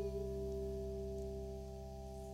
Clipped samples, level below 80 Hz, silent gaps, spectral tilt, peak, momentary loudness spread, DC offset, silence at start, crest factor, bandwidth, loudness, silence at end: under 0.1%; -50 dBFS; none; -7.5 dB/octave; -32 dBFS; 7 LU; under 0.1%; 0 s; 12 dB; 16 kHz; -45 LUFS; 0 s